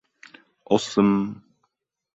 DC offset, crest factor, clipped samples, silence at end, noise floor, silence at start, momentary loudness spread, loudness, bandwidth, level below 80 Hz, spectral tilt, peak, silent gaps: under 0.1%; 22 dB; under 0.1%; 0.75 s; -74 dBFS; 0.7 s; 14 LU; -22 LUFS; 8 kHz; -62 dBFS; -6 dB/octave; -4 dBFS; none